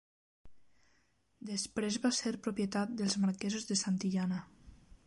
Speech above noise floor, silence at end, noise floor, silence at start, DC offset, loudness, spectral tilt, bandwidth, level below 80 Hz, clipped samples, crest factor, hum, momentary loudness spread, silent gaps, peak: 40 dB; 0.1 s; -74 dBFS; 0.45 s; under 0.1%; -35 LUFS; -4.5 dB/octave; 11.5 kHz; -68 dBFS; under 0.1%; 18 dB; none; 6 LU; none; -20 dBFS